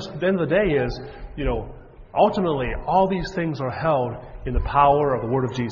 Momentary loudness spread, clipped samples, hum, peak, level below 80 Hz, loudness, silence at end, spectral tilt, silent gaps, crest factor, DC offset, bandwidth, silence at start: 11 LU; under 0.1%; none; -4 dBFS; -34 dBFS; -22 LUFS; 0 s; -7.5 dB/octave; none; 18 dB; under 0.1%; 7.4 kHz; 0 s